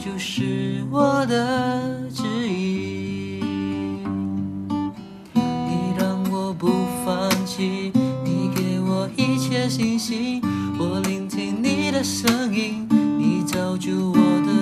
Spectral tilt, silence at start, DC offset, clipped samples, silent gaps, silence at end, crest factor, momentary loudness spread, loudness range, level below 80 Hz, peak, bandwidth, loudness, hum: -5.5 dB/octave; 0 s; under 0.1%; under 0.1%; none; 0 s; 20 dB; 7 LU; 4 LU; -58 dBFS; -2 dBFS; 14 kHz; -23 LUFS; none